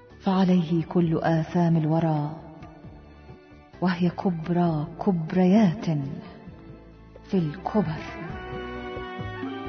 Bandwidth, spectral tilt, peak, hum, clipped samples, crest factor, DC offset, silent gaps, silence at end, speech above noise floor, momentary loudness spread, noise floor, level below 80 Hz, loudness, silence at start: 6.4 kHz; -9 dB/octave; -8 dBFS; none; under 0.1%; 16 dB; under 0.1%; none; 0 s; 24 dB; 20 LU; -48 dBFS; -52 dBFS; -25 LUFS; 0.1 s